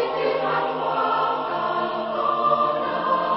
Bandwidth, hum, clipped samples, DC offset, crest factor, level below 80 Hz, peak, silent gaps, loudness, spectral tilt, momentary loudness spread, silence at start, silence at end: 5.8 kHz; none; under 0.1%; under 0.1%; 16 dB; -62 dBFS; -8 dBFS; none; -23 LUFS; -9 dB/octave; 4 LU; 0 s; 0 s